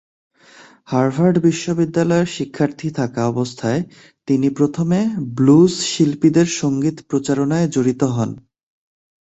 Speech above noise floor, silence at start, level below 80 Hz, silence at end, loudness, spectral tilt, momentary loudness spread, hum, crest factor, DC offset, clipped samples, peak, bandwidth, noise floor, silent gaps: 30 dB; 0.9 s; -54 dBFS; 0.9 s; -18 LUFS; -6 dB/octave; 8 LU; none; 16 dB; under 0.1%; under 0.1%; -2 dBFS; 8.2 kHz; -46 dBFS; none